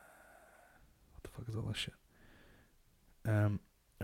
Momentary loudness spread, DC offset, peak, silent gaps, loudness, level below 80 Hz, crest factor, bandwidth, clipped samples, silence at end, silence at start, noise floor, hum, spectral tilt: 26 LU; under 0.1%; -22 dBFS; none; -39 LUFS; -62 dBFS; 20 dB; 15.5 kHz; under 0.1%; 0 s; 1.25 s; -68 dBFS; none; -6 dB/octave